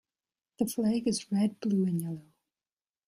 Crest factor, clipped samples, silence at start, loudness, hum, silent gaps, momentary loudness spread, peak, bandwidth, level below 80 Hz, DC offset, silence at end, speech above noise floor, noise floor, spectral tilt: 16 dB; under 0.1%; 0.6 s; -30 LUFS; none; none; 7 LU; -16 dBFS; 15.5 kHz; -70 dBFS; under 0.1%; 0.85 s; over 61 dB; under -90 dBFS; -6 dB/octave